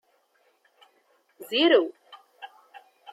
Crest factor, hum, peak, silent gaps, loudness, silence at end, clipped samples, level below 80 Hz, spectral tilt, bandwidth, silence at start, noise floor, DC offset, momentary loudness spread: 20 dB; none; -8 dBFS; none; -23 LUFS; 0.65 s; under 0.1%; under -90 dBFS; -3 dB/octave; 13.5 kHz; 1.4 s; -67 dBFS; under 0.1%; 27 LU